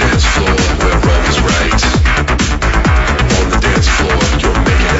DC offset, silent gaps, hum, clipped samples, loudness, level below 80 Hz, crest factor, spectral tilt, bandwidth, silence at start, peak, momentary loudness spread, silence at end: under 0.1%; none; none; under 0.1%; -12 LUFS; -14 dBFS; 10 dB; -4.5 dB/octave; 8 kHz; 0 s; 0 dBFS; 1 LU; 0 s